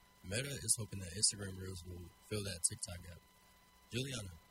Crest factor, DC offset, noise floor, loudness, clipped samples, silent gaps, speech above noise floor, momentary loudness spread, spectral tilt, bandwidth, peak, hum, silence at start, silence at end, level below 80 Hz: 26 dB; under 0.1%; -66 dBFS; -39 LUFS; under 0.1%; none; 25 dB; 17 LU; -2.5 dB/octave; 16 kHz; -16 dBFS; none; 0.25 s; 0.05 s; -64 dBFS